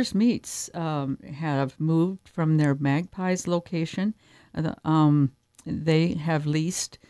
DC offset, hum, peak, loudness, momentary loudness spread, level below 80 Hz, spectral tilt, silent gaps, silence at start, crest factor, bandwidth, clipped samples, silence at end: under 0.1%; none; -8 dBFS; -26 LUFS; 9 LU; -60 dBFS; -6 dB/octave; none; 0 s; 16 dB; 11 kHz; under 0.1%; 0.15 s